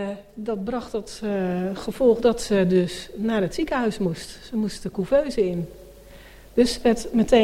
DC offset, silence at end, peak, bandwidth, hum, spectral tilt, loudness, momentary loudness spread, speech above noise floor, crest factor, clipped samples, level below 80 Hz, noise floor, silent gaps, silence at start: under 0.1%; 0 s; -4 dBFS; 16 kHz; none; -6 dB/octave; -24 LUFS; 11 LU; 23 dB; 18 dB; under 0.1%; -44 dBFS; -45 dBFS; none; 0 s